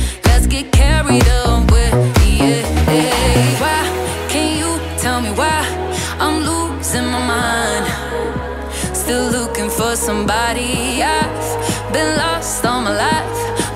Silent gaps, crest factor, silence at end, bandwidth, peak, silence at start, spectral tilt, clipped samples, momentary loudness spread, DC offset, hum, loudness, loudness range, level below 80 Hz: none; 12 dB; 0 s; 16 kHz; -2 dBFS; 0 s; -4.5 dB/octave; under 0.1%; 7 LU; under 0.1%; none; -16 LUFS; 5 LU; -20 dBFS